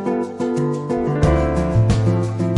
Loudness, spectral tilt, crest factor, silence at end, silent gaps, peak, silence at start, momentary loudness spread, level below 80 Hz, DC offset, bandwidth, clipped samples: -19 LUFS; -8 dB/octave; 14 dB; 0 s; none; -4 dBFS; 0 s; 5 LU; -30 dBFS; under 0.1%; 11 kHz; under 0.1%